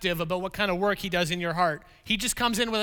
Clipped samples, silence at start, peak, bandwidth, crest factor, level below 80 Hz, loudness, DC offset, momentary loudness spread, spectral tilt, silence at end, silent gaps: under 0.1%; 0 s; -8 dBFS; over 20 kHz; 18 dB; -48 dBFS; -27 LUFS; under 0.1%; 4 LU; -3.5 dB/octave; 0 s; none